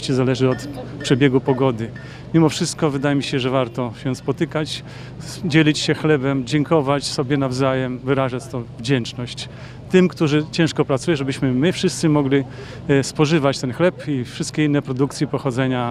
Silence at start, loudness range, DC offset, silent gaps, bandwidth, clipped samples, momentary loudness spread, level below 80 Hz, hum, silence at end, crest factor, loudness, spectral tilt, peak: 0 s; 2 LU; under 0.1%; none; 13.5 kHz; under 0.1%; 11 LU; -48 dBFS; none; 0 s; 18 dB; -20 LUFS; -6 dB/octave; 0 dBFS